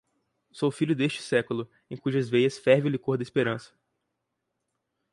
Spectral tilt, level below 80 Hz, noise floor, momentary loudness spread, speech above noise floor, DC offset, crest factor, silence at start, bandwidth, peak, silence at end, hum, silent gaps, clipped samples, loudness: -6.5 dB/octave; -70 dBFS; -81 dBFS; 11 LU; 55 dB; under 0.1%; 20 dB; 0.55 s; 11.5 kHz; -8 dBFS; 1.45 s; none; none; under 0.1%; -27 LUFS